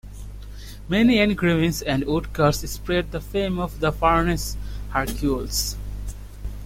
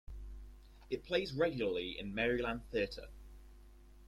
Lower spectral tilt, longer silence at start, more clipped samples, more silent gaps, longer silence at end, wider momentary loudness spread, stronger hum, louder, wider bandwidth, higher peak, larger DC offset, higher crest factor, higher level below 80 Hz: about the same, -5 dB/octave vs -6 dB/octave; about the same, 0.05 s vs 0.1 s; neither; neither; about the same, 0 s vs 0 s; second, 18 LU vs 21 LU; first, 50 Hz at -35 dBFS vs none; first, -22 LUFS vs -37 LUFS; first, 16.5 kHz vs 13.5 kHz; first, -6 dBFS vs -20 dBFS; neither; about the same, 16 dB vs 20 dB; first, -34 dBFS vs -54 dBFS